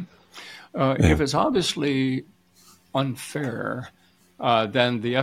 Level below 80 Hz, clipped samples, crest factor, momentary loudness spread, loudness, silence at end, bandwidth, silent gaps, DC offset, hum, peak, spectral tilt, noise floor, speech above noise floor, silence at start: -42 dBFS; under 0.1%; 22 dB; 20 LU; -23 LUFS; 0 s; 15.5 kHz; none; under 0.1%; none; -2 dBFS; -5.5 dB/octave; -56 dBFS; 33 dB; 0 s